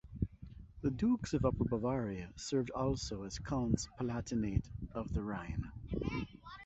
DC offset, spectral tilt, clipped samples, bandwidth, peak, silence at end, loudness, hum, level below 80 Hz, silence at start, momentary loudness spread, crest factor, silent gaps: under 0.1%; -7 dB/octave; under 0.1%; 8 kHz; -16 dBFS; 0 s; -38 LUFS; none; -48 dBFS; 0.05 s; 9 LU; 20 dB; none